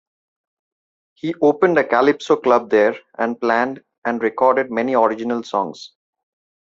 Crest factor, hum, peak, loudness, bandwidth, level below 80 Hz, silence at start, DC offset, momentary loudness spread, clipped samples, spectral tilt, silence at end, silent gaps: 18 dB; none; -2 dBFS; -18 LUFS; 7.6 kHz; -64 dBFS; 1.25 s; under 0.1%; 10 LU; under 0.1%; -6 dB/octave; 0.85 s; 3.98-4.02 s